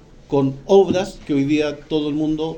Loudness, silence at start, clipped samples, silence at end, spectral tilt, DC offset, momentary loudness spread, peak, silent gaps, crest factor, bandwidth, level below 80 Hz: -19 LUFS; 0.3 s; under 0.1%; 0 s; -6.5 dB/octave; under 0.1%; 8 LU; -2 dBFS; none; 18 dB; 8.8 kHz; -46 dBFS